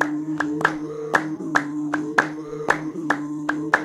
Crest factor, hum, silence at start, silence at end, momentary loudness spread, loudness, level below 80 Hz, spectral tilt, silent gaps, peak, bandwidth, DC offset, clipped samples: 20 dB; none; 0 s; 0 s; 5 LU; -24 LUFS; -60 dBFS; -5 dB/octave; none; -4 dBFS; 12.5 kHz; under 0.1%; under 0.1%